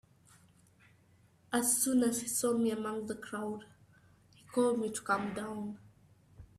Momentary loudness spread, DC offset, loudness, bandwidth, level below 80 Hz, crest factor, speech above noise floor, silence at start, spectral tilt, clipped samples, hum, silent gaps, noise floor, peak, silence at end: 13 LU; under 0.1%; -33 LUFS; 15.5 kHz; -70 dBFS; 18 dB; 33 dB; 1.5 s; -3.5 dB/octave; under 0.1%; none; none; -66 dBFS; -16 dBFS; 0.15 s